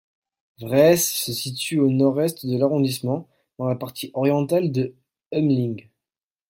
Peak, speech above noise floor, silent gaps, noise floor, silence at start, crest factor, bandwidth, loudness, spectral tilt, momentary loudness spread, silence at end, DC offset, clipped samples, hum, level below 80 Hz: -4 dBFS; over 69 dB; 5.26-5.30 s; under -90 dBFS; 0.6 s; 18 dB; 16.5 kHz; -22 LUFS; -5.5 dB/octave; 12 LU; 0.7 s; under 0.1%; under 0.1%; none; -62 dBFS